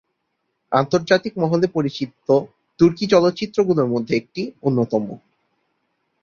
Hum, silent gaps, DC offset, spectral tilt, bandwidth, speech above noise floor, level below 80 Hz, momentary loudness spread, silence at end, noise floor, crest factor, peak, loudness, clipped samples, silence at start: none; none; under 0.1%; -6.5 dB/octave; 7.2 kHz; 55 dB; -56 dBFS; 10 LU; 1.05 s; -74 dBFS; 18 dB; -2 dBFS; -20 LUFS; under 0.1%; 0.7 s